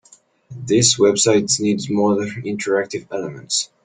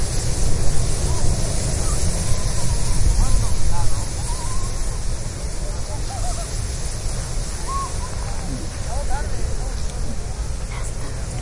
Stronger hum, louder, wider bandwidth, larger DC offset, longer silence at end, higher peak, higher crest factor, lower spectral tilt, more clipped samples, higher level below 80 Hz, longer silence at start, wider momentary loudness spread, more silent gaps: neither; first, -18 LUFS vs -25 LUFS; second, 10 kHz vs 11.5 kHz; neither; first, 0.2 s vs 0 s; about the same, -2 dBFS vs -2 dBFS; about the same, 18 dB vs 16 dB; about the same, -3.5 dB/octave vs -4 dB/octave; neither; second, -56 dBFS vs -24 dBFS; first, 0.5 s vs 0 s; first, 13 LU vs 7 LU; neither